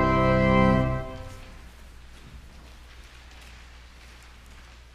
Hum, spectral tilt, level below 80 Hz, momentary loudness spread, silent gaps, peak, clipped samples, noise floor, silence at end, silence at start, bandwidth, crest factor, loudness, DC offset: none; -7.5 dB/octave; -38 dBFS; 28 LU; none; -8 dBFS; under 0.1%; -48 dBFS; 0.35 s; 0 s; 11.5 kHz; 20 dB; -22 LUFS; under 0.1%